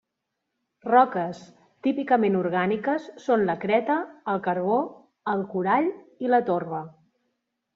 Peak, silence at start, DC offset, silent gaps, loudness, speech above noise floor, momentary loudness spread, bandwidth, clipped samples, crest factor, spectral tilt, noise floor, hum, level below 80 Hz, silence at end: -6 dBFS; 0.85 s; under 0.1%; none; -25 LUFS; 58 dB; 12 LU; 7.4 kHz; under 0.1%; 20 dB; -5.5 dB/octave; -82 dBFS; none; -70 dBFS; 0.85 s